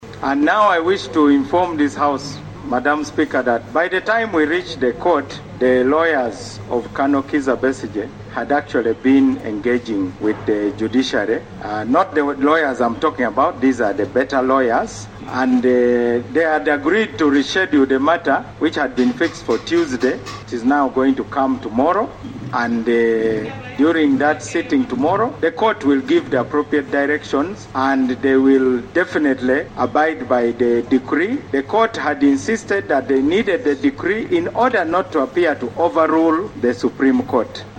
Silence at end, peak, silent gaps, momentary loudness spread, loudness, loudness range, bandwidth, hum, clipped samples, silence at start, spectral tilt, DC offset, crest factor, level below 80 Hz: 0 s; -2 dBFS; none; 7 LU; -17 LUFS; 2 LU; 9 kHz; none; under 0.1%; 0 s; -5.5 dB/octave; under 0.1%; 16 dB; -48 dBFS